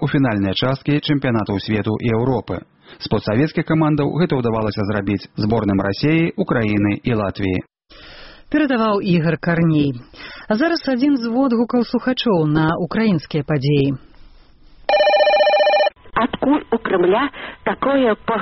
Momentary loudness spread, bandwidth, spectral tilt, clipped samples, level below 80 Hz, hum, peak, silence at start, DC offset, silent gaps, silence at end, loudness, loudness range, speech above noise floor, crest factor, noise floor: 7 LU; 6 kHz; -5.5 dB/octave; under 0.1%; -44 dBFS; none; -4 dBFS; 0 s; under 0.1%; none; 0 s; -18 LUFS; 3 LU; 28 dB; 14 dB; -46 dBFS